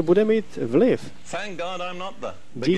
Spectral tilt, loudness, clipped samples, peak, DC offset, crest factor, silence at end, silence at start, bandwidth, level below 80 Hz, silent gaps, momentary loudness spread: -6.5 dB/octave; -24 LUFS; under 0.1%; -8 dBFS; 2%; 16 dB; 0 s; 0 s; 11 kHz; -58 dBFS; none; 14 LU